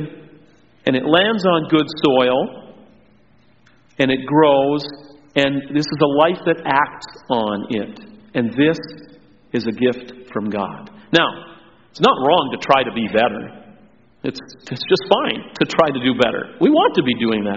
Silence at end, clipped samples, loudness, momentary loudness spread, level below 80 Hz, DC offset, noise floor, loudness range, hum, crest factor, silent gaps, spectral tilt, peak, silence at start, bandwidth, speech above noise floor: 0 s; under 0.1%; -18 LUFS; 14 LU; -56 dBFS; 0.2%; -55 dBFS; 4 LU; none; 18 dB; none; -3.5 dB/octave; 0 dBFS; 0 s; 7.6 kHz; 37 dB